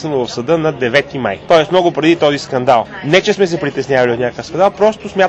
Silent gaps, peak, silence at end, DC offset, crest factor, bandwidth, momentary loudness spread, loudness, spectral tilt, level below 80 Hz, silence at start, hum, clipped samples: none; 0 dBFS; 0 s; under 0.1%; 14 dB; 8.6 kHz; 7 LU; -14 LUFS; -5.5 dB/octave; -48 dBFS; 0 s; none; under 0.1%